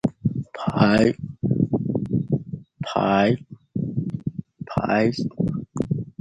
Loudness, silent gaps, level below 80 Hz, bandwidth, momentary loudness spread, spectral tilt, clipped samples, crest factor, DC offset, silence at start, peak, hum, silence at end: -24 LUFS; none; -50 dBFS; 9.4 kHz; 11 LU; -8 dB/octave; under 0.1%; 20 dB; under 0.1%; 0.05 s; -4 dBFS; none; 0.15 s